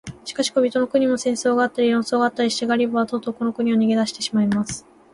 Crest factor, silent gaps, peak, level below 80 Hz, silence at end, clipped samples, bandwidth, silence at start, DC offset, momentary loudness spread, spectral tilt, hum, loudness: 14 dB; none; -6 dBFS; -58 dBFS; 0.35 s; under 0.1%; 11.5 kHz; 0.05 s; under 0.1%; 6 LU; -4.5 dB/octave; none; -21 LUFS